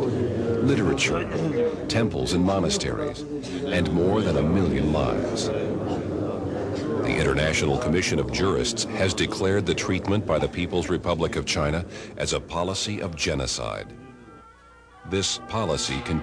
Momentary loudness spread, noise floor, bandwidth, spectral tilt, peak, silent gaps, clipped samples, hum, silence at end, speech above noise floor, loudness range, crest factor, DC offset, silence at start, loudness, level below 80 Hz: 7 LU; -51 dBFS; 11 kHz; -5 dB/octave; -10 dBFS; none; under 0.1%; none; 0 s; 26 dB; 5 LU; 14 dB; under 0.1%; 0 s; -25 LUFS; -42 dBFS